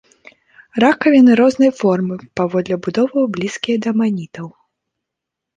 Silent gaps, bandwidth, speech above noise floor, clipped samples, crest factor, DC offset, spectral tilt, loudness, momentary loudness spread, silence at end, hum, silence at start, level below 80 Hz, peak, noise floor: none; 9.2 kHz; 67 dB; under 0.1%; 14 dB; under 0.1%; -6.5 dB/octave; -15 LUFS; 15 LU; 1.1 s; none; 0.75 s; -60 dBFS; -2 dBFS; -82 dBFS